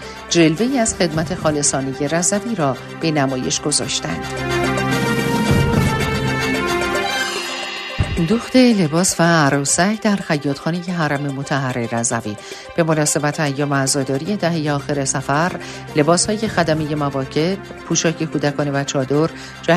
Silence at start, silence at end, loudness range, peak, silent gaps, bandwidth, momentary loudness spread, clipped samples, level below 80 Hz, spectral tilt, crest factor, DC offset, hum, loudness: 0 s; 0 s; 3 LU; -2 dBFS; none; 13.5 kHz; 7 LU; under 0.1%; -40 dBFS; -4.5 dB/octave; 16 dB; under 0.1%; none; -18 LUFS